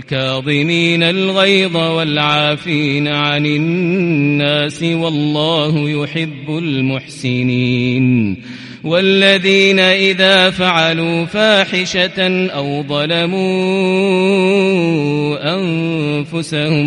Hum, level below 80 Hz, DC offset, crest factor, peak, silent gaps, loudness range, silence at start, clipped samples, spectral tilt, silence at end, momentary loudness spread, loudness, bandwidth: none; -52 dBFS; under 0.1%; 14 dB; 0 dBFS; none; 5 LU; 0 s; under 0.1%; -5.5 dB/octave; 0 s; 9 LU; -13 LUFS; 11.5 kHz